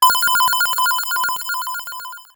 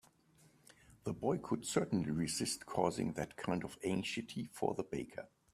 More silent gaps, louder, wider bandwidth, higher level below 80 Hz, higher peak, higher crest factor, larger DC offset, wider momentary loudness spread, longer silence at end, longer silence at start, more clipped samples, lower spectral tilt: neither; first, -17 LUFS vs -39 LUFS; first, over 20 kHz vs 15.5 kHz; first, -60 dBFS vs -68 dBFS; first, 0 dBFS vs -16 dBFS; about the same, 18 dB vs 22 dB; neither; first, 13 LU vs 9 LU; second, 0.1 s vs 0.25 s; second, 0 s vs 0.9 s; neither; second, 2.5 dB/octave vs -5 dB/octave